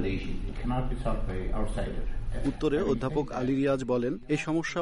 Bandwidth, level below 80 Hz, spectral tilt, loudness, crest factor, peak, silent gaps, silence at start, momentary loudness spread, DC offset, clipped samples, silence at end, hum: 11 kHz; -34 dBFS; -7 dB/octave; -31 LUFS; 12 dB; -16 dBFS; none; 0 s; 8 LU; under 0.1%; under 0.1%; 0 s; none